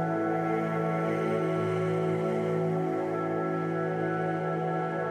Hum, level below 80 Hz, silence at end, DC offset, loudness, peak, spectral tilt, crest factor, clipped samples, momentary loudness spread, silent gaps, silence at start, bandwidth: none; -76 dBFS; 0 s; under 0.1%; -29 LUFS; -18 dBFS; -8.5 dB/octave; 12 dB; under 0.1%; 2 LU; none; 0 s; 9.4 kHz